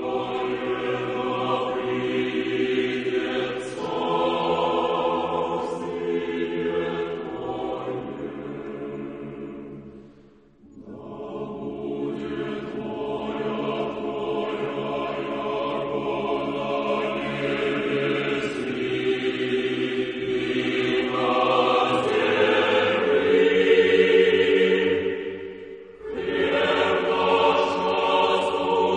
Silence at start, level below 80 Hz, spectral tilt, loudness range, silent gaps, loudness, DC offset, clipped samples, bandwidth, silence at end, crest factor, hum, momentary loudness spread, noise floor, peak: 0 s; -60 dBFS; -5.5 dB/octave; 14 LU; none; -24 LUFS; under 0.1%; under 0.1%; 9.8 kHz; 0 s; 18 dB; none; 14 LU; -53 dBFS; -6 dBFS